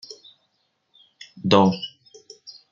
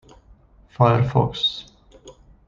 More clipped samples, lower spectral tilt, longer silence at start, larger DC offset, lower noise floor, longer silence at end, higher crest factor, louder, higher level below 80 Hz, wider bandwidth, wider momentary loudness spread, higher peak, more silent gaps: neither; about the same, -6.5 dB/octave vs -7 dB/octave; second, 0.1 s vs 0.8 s; neither; first, -71 dBFS vs -52 dBFS; second, 0.2 s vs 0.35 s; about the same, 24 dB vs 20 dB; about the same, -20 LUFS vs -20 LUFS; second, -62 dBFS vs -48 dBFS; about the same, 7.4 kHz vs 7.4 kHz; first, 26 LU vs 6 LU; about the same, -2 dBFS vs -2 dBFS; neither